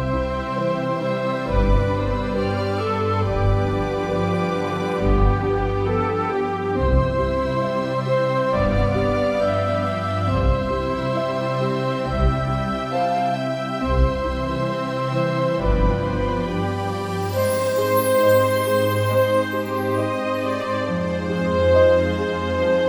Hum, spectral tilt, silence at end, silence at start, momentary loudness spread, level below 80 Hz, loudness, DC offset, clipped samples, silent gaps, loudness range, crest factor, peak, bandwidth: none; -7 dB/octave; 0 s; 0 s; 5 LU; -30 dBFS; -21 LUFS; under 0.1%; under 0.1%; none; 3 LU; 16 dB; -4 dBFS; over 20 kHz